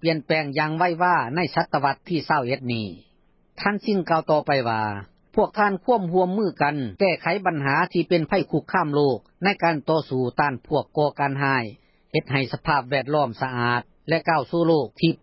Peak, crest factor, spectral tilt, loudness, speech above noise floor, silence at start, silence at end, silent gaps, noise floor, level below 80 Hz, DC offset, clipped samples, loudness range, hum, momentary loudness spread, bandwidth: -4 dBFS; 18 dB; -10.5 dB/octave; -23 LUFS; 35 dB; 0.05 s; 0.05 s; none; -57 dBFS; -56 dBFS; under 0.1%; under 0.1%; 2 LU; none; 5 LU; 5.8 kHz